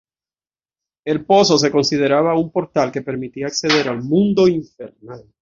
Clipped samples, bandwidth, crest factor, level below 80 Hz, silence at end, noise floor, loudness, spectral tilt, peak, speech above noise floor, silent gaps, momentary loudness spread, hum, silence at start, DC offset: under 0.1%; 7.6 kHz; 16 dB; -56 dBFS; 0.2 s; under -90 dBFS; -17 LUFS; -5 dB/octave; -2 dBFS; over 73 dB; none; 13 LU; none; 1.05 s; under 0.1%